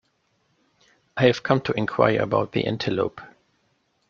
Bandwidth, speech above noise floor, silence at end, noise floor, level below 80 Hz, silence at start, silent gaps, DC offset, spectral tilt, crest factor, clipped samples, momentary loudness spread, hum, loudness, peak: 7.2 kHz; 47 dB; 0.85 s; -69 dBFS; -58 dBFS; 1.15 s; none; under 0.1%; -6.5 dB/octave; 22 dB; under 0.1%; 9 LU; none; -23 LUFS; -2 dBFS